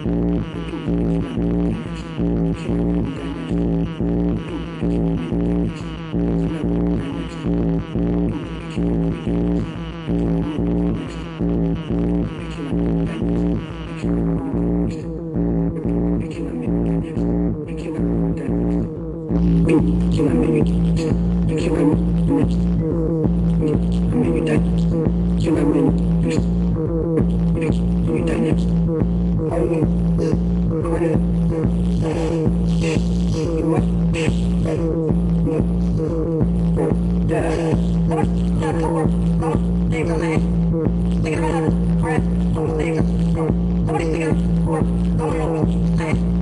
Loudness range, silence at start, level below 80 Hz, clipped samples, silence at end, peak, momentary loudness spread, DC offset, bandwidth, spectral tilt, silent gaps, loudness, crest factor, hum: 4 LU; 0 s; -26 dBFS; under 0.1%; 0 s; -4 dBFS; 5 LU; under 0.1%; 10.5 kHz; -8.5 dB/octave; none; -20 LUFS; 14 dB; none